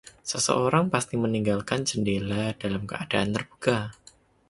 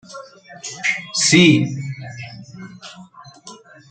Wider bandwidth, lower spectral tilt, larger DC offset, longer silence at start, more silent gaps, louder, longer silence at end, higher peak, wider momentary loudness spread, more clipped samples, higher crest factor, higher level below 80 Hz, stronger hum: first, 11.5 kHz vs 9.4 kHz; about the same, -4.5 dB/octave vs -3.5 dB/octave; neither; first, 0.25 s vs 0.1 s; neither; second, -26 LUFS vs -15 LUFS; first, 0.6 s vs 0.35 s; second, -6 dBFS vs -2 dBFS; second, 8 LU vs 26 LU; neither; about the same, 20 dB vs 20 dB; first, -54 dBFS vs -60 dBFS; neither